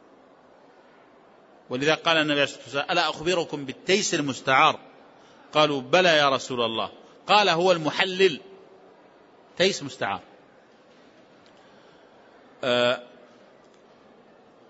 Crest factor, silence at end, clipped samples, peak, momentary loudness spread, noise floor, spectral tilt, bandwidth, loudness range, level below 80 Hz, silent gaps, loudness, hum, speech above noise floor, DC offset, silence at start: 22 dB; 1.65 s; under 0.1%; -4 dBFS; 13 LU; -55 dBFS; -3.5 dB/octave; 8 kHz; 10 LU; -70 dBFS; none; -23 LUFS; none; 32 dB; under 0.1%; 1.7 s